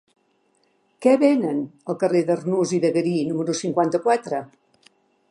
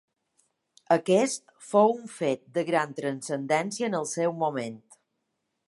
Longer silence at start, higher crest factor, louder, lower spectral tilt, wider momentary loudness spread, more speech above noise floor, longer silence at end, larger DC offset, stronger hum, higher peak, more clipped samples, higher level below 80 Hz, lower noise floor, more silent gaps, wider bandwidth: about the same, 1 s vs 0.9 s; about the same, 18 dB vs 20 dB; first, -22 LUFS vs -27 LUFS; first, -6 dB/octave vs -4.5 dB/octave; about the same, 9 LU vs 10 LU; second, 45 dB vs 53 dB; about the same, 0.85 s vs 0.9 s; neither; neither; first, -4 dBFS vs -8 dBFS; neither; first, -74 dBFS vs -80 dBFS; second, -65 dBFS vs -80 dBFS; neither; about the same, 11.5 kHz vs 11.5 kHz